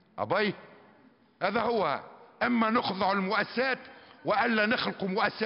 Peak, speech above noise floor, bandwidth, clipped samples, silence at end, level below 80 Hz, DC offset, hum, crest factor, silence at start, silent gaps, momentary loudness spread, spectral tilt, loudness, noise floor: -12 dBFS; 32 dB; 5.8 kHz; under 0.1%; 0 s; -70 dBFS; under 0.1%; none; 18 dB; 0.15 s; none; 7 LU; -2.5 dB/octave; -29 LUFS; -60 dBFS